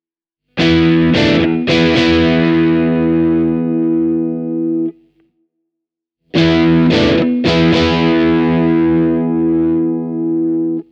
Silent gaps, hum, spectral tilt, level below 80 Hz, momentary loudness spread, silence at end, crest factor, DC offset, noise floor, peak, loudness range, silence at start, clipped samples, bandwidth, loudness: none; none; -7 dB/octave; -36 dBFS; 7 LU; 0.1 s; 14 dB; under 0.1%; -80 dBFS; 0 dBFS; 5 LU; 0.55 s; under 0.1%; 7.4 kHz; -13 LUFS